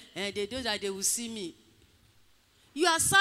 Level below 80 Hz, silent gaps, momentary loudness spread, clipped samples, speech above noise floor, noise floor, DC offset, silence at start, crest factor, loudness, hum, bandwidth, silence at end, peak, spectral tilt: -64 dBFS; none; 16 LU; under 0.1%; 35 dB; -64 dBFS; under 0.1%; 0 s; 20 dB; -29 LUFS; none; 16 kHz; 0 s; -10 dBFS; -1.5 dB/octave